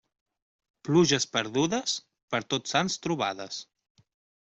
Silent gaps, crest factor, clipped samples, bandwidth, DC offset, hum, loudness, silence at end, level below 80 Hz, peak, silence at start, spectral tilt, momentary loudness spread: 2.23-2.28 s; 20 dB; under 0.1%; 8.2 kHz; under 0.1%; none; -27 LUFS; 0.8 s; -66 dBFS; -10 dBFS; 0.85 s; -4 dB/octave; 14 LU